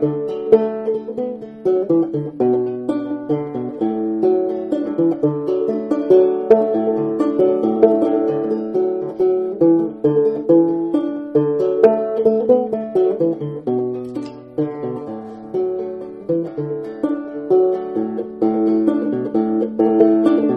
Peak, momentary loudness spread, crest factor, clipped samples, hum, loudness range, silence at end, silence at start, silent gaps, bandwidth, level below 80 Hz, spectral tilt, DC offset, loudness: 0 dBFS; 10 LU; 18 dB; under 0.1%; none; 6 LU; 0 s; 0 s; none; 5.4 kHz; -60 dBFS; -10 dB/octave; under 0.1%; -18 LUFS